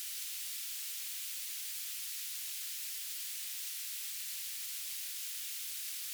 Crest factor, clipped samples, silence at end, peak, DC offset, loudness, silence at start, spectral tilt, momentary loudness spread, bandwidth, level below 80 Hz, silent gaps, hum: 14 dB; under 0.1%; 0 s; -28 dBFS; under 0.1%; -38 LUFS; 0 s; 10 dB/octave; 0 LU; over 20 kHz; under -90 dBFS; none; none